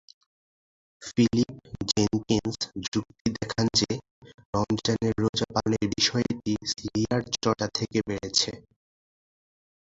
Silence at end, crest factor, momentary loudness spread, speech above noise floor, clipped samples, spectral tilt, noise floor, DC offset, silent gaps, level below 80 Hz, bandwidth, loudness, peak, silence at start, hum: 1.2 s; 20 dB; 8 LU; over 63 dB; under 0.1%; -4.5 dB/octave; under -90 dBFS; under 0.1%; 2.88-2.92 s, 3.21-3.25 s, 4.11-4.22 s, 4.34-4.38 s, 4.45-4.53 s, 5.29-5.33 s; -52 dBFS; 8 kHz; -27 LUFS; -8 dBFS; 1 s; none